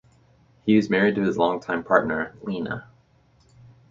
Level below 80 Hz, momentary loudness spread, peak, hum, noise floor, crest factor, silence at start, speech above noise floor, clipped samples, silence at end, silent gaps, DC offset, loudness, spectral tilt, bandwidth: -58 dBFS; 11 LU; -2 dBFS; none; -59 dBFS; 22 dB; 0.65 s; 37 dB; under 0.1%; 1.1 s; none; under 0.1%; -23 LUFS; -7 dB/octave; 7.4 kHz